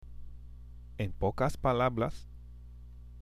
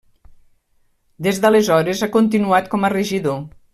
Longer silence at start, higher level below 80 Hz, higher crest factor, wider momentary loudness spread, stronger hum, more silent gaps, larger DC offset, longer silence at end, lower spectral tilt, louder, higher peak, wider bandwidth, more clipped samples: second, 0 s vs 1.2 s; first, -46 dBFS vs -54 dBFS; about the same, 18 dB vs 16 dB; first, 23 LU vs 8 LU; first, 60 Hz at -50 dBFS vs none; neither; neither; second, 0 s vs 0.25 s; first, -7 dB/octave vs -5.5 dB/octave; second, -32 LUFS vs -17 LUFS; second, -16 dBFS vs -2 dBFS; about the same, 15 kHz vs 14.5 kHz; neither